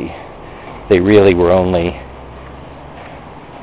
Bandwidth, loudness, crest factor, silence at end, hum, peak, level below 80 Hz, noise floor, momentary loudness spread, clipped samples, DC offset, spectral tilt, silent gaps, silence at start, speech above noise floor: 4 kHz; -12 LUFS; 16 dB; 0 s; none; 0 dBFS; -34 dBFS; -33 dBFS; 24 LU; under 0.1%; under 0.1%; -11 dB/octave; none; 0 s; 23 dB